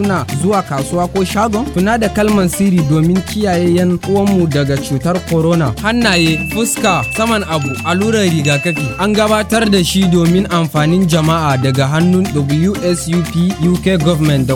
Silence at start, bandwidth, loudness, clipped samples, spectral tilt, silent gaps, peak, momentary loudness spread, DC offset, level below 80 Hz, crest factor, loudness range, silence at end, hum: 0 s; 17.5 kHz; -13 LUFS; under 0.1%; -5.5 dB/octave; none; 0 dBFS; 4 LU; 0.2%; -34 dBFS; 12 dB; 1 LU; 0 s; none